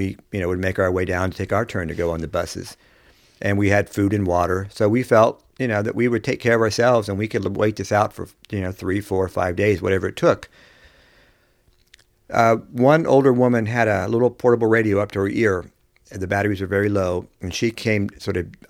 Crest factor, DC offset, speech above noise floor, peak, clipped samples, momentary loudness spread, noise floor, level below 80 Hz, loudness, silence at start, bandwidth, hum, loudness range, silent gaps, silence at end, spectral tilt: 20 dB; under 0.1%; 40 dB; 0 dBFS; under 0.1%; 10 LU; -59 dBFS; -48 dBFS; -20 LUFS; 0 s; 16.5 kHz; none; 6 LU; none; 0.15 s; -6.5 dB/octave